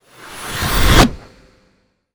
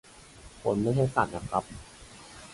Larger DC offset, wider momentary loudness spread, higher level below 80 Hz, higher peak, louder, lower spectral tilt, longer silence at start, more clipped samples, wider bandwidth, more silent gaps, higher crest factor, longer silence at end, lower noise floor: neither; second, 19 LU vs 23 LU; first, -22 dBFS vs -52 dBFS; first, 0 dBFS vs -8 dBFS; first, -15 LUFS vs -29 LUFS; second, -4 dB/octave vs -6.5 dB/octave; about the same, 0.2 s vs 0.2 s; neither; first, over 20 kHz vs 11.5 kHz; neither; second, 16 dB vs 22 dB; first, 0.95 s vs 0 s; first, -60 dBFS vs -51 dBFS